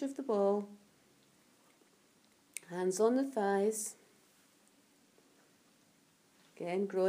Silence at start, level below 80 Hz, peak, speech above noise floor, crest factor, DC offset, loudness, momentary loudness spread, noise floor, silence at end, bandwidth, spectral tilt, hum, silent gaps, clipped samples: 0 s; under -90 dBFS; -18 dBFS; 36 dB; 20 dB; under 0.1%; -34 LUFS; 17 LU; -69 dBFS; 0 s; 15.5 kHz; -5 dB/octave; none; none; under 0.1%